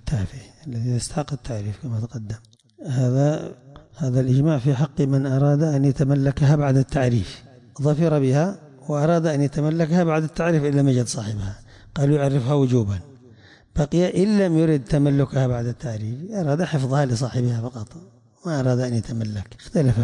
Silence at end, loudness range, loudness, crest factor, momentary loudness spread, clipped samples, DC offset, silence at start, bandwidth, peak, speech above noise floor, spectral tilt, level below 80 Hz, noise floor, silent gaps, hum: 0 s; 5 LU; -21 LUFS; 12 dB; 13 LU; under 0.1%; under 0.1%; 0.05 s; 11 kHz; -8 dBFS; 29 dB; -7.5 dB/octave; -44 dBFS; -49 dBFS; none; none